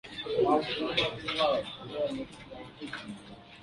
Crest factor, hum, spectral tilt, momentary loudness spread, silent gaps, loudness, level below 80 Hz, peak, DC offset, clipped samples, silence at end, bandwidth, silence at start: 20 dB; none; -5 dB/octave; 18 LU; none; -31 LUFS; -60 dBFS; -12 dBFS; under 0.1%; under 0.1%; 0 s; 11.5 kHz; 0.05 s